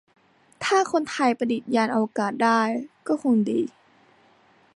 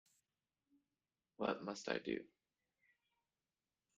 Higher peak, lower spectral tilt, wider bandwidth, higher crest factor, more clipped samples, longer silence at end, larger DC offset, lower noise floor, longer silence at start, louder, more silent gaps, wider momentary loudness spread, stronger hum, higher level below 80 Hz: first, -6 dBFS vs -22 dBFS; about the same, -5 dB/octave vs -4.5 dB/octave; first, 11.5 kHz vs 9 kHz; second, 18 dB vs 28 dB; neither; second, 1.05 s vs 1.7 s; neither; second, -58 dBFS vs under -90 dBFS; second, 0.6 s vs 1.4 s; first, -24 LUFS vs -44 LUFS; neither; about the same, 7 LU vs 5 LU; neither; first, -74 dBFS vs -84 dBFS